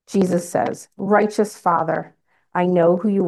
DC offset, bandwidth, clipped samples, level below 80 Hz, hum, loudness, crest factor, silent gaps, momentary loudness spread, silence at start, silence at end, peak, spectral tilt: under 0.1%; 12.5 kHz; under 0.1%; -66 dBFS; none; -20 LUFS; 16 dB; none; 10 LU; 0.1 s; 0 s; -4 dBFS; -7 dB/octave